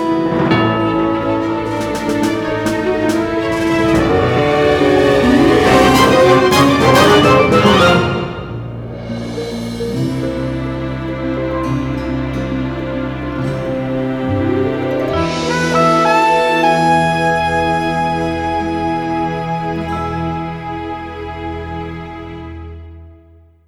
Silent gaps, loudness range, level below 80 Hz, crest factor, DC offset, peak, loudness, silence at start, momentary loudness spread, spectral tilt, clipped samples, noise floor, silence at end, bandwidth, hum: none; 11 LU; -34 dBFS; 14 dB; under 0.1%; 0 dBFS; -14 LUFS; 0 s; 15 LU; -5.5 dB/octave; under 0.1%; -45 dBFS; 0.55 s; 19.5 kHz; none